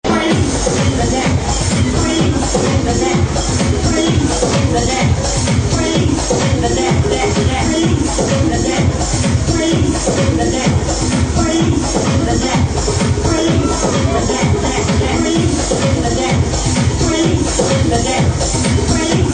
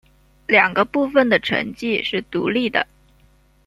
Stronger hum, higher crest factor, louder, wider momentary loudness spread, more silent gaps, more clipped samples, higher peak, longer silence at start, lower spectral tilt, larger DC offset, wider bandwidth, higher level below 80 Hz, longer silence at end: neither; about the same, 14 dB vs 18 dB; first, -14 LUFS vs -19 LUFS; second, 1 LU vs 8 LU; neither; neither; about the same, 0 dBFS vs -2 dBFS; second, 0.05 s vs 0.5 s; about the same, -5 dB/octave vs -5.5 dB/octave; neither; second, 9.6 kHz vs 12.5 kHz; first, -24 dBFS vs -54 dBFS; second, 0 s vs 0.85 s